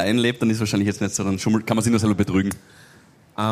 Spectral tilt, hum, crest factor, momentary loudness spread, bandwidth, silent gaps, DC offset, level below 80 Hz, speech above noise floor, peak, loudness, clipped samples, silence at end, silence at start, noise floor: -5 dB/octave; none; 16 dB; 7 LU; 15.5 kHz; none; under 0.1%; -52 dBFS; 31 dB; -4 dBFS; -21 LUFS; under 0.1%; 0 s; 0 s; -51 dBFS